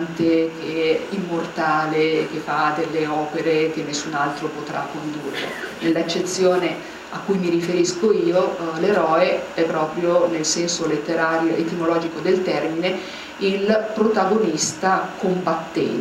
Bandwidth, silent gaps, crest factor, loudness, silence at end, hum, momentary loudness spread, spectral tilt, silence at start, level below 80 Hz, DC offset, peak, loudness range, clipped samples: 14 kHz; none; 16 dB; -21 LUFS; 0 s; none; 8 LU; -4.5 dB/octave; 0 s; -60 dBFS; under 0.1%; -4 dBFS; 4 LU; under 0.1%